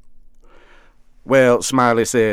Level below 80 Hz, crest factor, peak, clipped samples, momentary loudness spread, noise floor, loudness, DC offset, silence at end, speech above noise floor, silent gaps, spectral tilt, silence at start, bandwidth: -48 dBFS; 16 dB; -2 dBFS; under 0.1%; 3 LU; -47 dBFS; -15 LUFS; under 0.1%; 0 s; 32 dB; none; -4.5 dB/octave; 0.1 s; 16 kHz